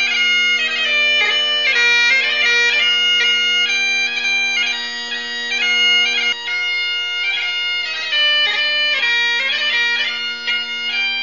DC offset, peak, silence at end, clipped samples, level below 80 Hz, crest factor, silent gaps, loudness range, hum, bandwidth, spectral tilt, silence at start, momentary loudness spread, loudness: 0.5%; -2 dBFS; 0 s; under 0.1%; -68 dBFS; 14 dB; none; 3 LU; none; 7.4 kHz; 2 dB/octave; 0 s; 7 LU; -14 LUFS